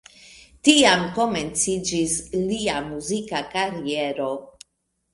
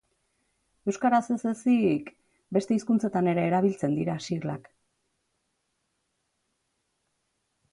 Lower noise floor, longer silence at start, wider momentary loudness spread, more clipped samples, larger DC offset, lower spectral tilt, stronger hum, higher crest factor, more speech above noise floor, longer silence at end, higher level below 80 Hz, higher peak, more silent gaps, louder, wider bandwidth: about the same, -74 dBFS vs -77 dBFS; second, 0.25 s vs 0.85 s; first, 12 LU vs 9 LU; neither; neither; second, -3 dB/octave vs -7 dB/octave; neither; first, 24 dB vs 18 dB; about the same, 52 dB vs 52 dB; second, 0.65 s vs 3.1 s; first, -52 dBFS vs -70 dBFS; first, 0 dBFS vs -10 dBFS; neither; first, -22 LUFS vs -27 LUFS; about the same, 11.5 kHz vs 11 kHz